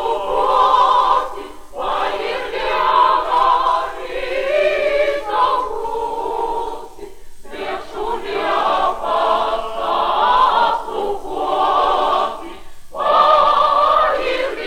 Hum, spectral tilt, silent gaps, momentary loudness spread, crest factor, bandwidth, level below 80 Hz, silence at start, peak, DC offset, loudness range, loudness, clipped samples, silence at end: none; -3 dB/octave; none; 13 LU; 14 dB; 16 kHz; -42 dBFS; 0 s; -2 dBFS; under 0.1%; 6 LU; -17 LUFS; under 0.1%; 0 s